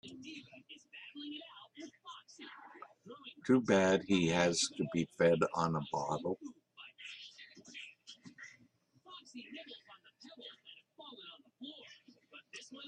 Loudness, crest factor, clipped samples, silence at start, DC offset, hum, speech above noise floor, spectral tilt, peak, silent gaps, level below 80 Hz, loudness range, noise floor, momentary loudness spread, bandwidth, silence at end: -33 LUFS; 24 dB; under 0.1%; 0.05 s; under 0.1%; none; 38 dB; -4.5 dB/octave; -14 dBFS; none; -74 dBFS; 21 LU; -70 dBFS; 24 LU; 10.5 kHz; 0 s